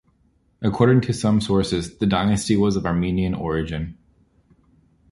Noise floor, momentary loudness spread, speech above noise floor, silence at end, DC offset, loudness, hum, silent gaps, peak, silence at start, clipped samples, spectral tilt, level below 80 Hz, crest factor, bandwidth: -62 dBFS; 9 LU; 42 dB; 1.2 s; under 0.1%; -21 LUFS; none; none; -2 dBFS; 0.6 s; under 0.1%; -6.5 dB/octave; -40 dBFS; 18 dB; 11.5 kHz